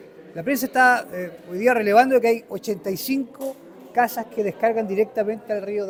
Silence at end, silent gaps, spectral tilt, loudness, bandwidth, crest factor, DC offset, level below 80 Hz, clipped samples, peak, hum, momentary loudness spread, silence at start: 0 s; none; -4.5 dB/octave; -21 LUFS; over 20 kHz; 18 dB; under 0.1%; -66 dBFS; under 0.1%; -4 dBFS; none; 15 LU; 0 s